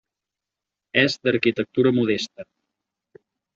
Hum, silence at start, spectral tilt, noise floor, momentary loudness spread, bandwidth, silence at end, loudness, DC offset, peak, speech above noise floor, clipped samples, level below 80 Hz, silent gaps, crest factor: none; 0.95 s; -5.5 dB/octave; -86 dBFS; 5 LU; 7.6 kHz; 1.1 s; -21 LUFS; under 0.1%; -4 dBFS; 65 dB; under 0.1%; -64 dBFS; none; 20 dB